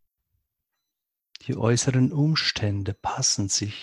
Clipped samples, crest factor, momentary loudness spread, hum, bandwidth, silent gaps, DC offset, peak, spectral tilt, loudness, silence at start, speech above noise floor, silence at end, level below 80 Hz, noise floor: under 0.1%; 18 dB; 8 LU; none; 12 kHz; none; under 0.1%; -8 dBFS; -4 dB/octave; -24 LUFS; 1.45 s; 60 dB; 0 s; -50 dBFS; -84 dBFS